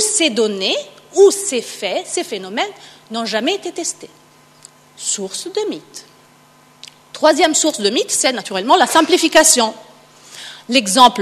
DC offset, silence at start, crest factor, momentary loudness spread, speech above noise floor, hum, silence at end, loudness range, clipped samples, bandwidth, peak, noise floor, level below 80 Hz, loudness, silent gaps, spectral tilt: under 0.1%; 0 s; 18 dB; 15 LU; 33 dB; none; 0 s; 10 LU; under 0.1%; 13.5 kHz; 0 dBFS; -48 dBFS; -60 dBFS; -15 LUFS; none; -1.5 dB/octave